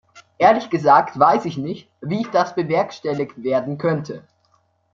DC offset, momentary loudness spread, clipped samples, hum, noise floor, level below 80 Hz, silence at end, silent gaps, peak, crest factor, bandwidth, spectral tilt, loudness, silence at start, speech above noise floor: under 0.1%; 13 LU; under 0.1%; none; -63 dBFS; -64 dBFS; 0.75 s; none; -2 dBFS; 18 dB; 7.4 kHz; -7 dB/octave; -19 LUFS; 0.15 s; 44 dB